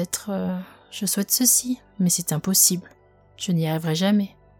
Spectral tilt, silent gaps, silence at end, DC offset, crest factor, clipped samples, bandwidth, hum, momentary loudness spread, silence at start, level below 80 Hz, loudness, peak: -3.5 dB/octave; none; 0.3 s; under 0.1%; 20 dB; under 0.1%; 18 kHz; none; 14 LU; 0 s; -62 dBFS; -21 LUFS; -4 dBFS